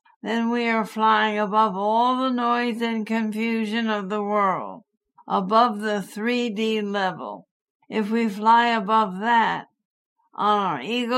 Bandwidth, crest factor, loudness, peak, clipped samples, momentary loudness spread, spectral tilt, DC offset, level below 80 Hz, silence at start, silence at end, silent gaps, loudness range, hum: 14 kHz; 18 dB; -22 LUFS; -6 dBFS; under 0.1%; 8 LU; -5.5 dB/octave; under 0.1%; -76 dBFS; 0.25 s; 0 s; 7.51-7.80 s, 9.85-10.16 s; 3 LU; none